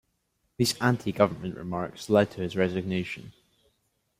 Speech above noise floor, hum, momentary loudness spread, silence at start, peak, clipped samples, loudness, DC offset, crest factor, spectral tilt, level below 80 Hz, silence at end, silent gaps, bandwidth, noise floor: 48 dB; none; 10 LU; 0.6 s; -6 dBFS; under 0.1%; -27 LUFS; under 0.1%; 22 dB; -5.5 dB/octave; -62 dBFS; 0.9 s; none; 16 kHz; -75 dBFS